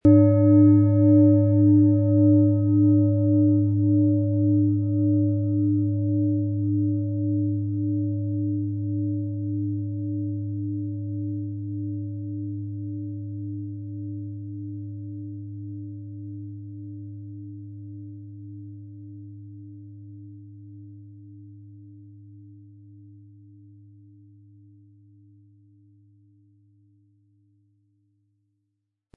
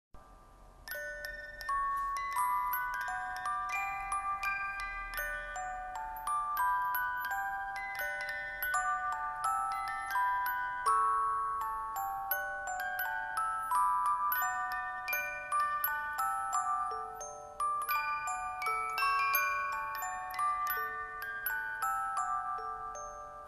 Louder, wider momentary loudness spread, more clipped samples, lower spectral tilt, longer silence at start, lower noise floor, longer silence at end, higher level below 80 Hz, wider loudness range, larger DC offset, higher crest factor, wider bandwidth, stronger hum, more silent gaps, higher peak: first, -22 LUFS vs -34 LUFS; first, 25 LU vs 9 LU; neither; first, -15 dB/octave vs -0.5 dB/octave; about the same, 0.05 s vs 0.15 s; first, -79 dBFS vs -56 dBFS; first, 6.55 s vs 0 s; about the same, -62 dBFS vs -60 dBFS; first, 24 LU vs 3 LU; neither; about the same, 18 dB vs 18 dB; second, 2.3 kHz vs 13 kHz; neither; neither; first, -6 dBFS vs -16 dBFS